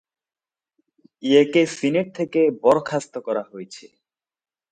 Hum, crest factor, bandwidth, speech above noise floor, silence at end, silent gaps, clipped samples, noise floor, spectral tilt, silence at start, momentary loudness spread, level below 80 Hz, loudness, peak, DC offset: none; 20 dB; 9.4 kHz; over 70 dB; 0.85 s; none; under 0.1%; under -90 dBFS; -5.5 dB/octave; 1.25 s; 16 LU; -68 dBFS; -20 LUFS; -2 dBFS; under 0.1%